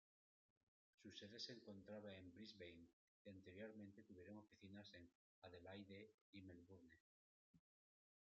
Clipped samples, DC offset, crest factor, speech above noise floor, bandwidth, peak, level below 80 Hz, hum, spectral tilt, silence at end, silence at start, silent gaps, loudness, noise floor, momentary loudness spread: under 0.1%; under 0.1%; 24 dB; over 28 dB; 7.2 kHz; -40 dBFS; under -90 dBFS; none; -4 dB/octave; 0.6 s; 1 s; 2.93-3.25 s, 5.15-5.42 s, 6.14-6.33 s, 7.00-7.54 s; -62 LUFS; under -90 dBFS; 12 LU